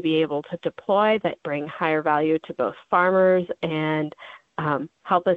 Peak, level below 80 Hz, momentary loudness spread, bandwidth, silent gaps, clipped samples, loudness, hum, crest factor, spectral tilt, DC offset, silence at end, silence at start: -6 dBFS; -68 dBFS; 10 LU; 4.9 kHz; none; under 0.1%; -23 LUFS; none; 16 dB; -8.5 dB/octave; under 0.1%; 0 s; 0 s